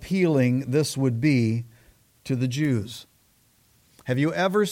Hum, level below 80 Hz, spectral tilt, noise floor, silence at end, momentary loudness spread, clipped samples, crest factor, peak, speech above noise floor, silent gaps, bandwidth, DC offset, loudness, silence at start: none; -58 dBFS; -6.5 dB/octave; -62 dBFS; 0 s; 18 LU; under 0.1%; 14 dB; -10 dBFS; 39 dB; none; 16.5 kHz; under 0.1%; -24 LUFS; 0 s